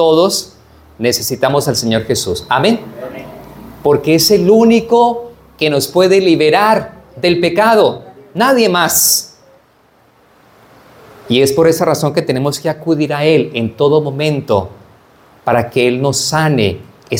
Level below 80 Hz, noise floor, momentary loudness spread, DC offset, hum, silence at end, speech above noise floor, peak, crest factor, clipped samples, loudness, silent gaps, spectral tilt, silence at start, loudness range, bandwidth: -48 dBFS; -50 dBFS; 13 LU; under 0.1%; none; 0 s; 39 dB; 0 dBFS; 14 dB; under 0.1%; -12 LUFS; none; -4 dB/octave; 0 s; 4 LU; 18 kHz